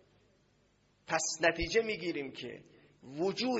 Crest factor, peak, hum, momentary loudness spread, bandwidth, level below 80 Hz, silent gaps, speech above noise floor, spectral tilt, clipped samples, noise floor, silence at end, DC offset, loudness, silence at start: 22 dB; -14 dBFS; none; 17 LU; 7.6 kHz; -56 dBFS; none; 37 dB; -2.5 dB/octave; under 0.1%; -70 dBFS; 0 s; under 0.1%; -33 LUFS; 1.1 s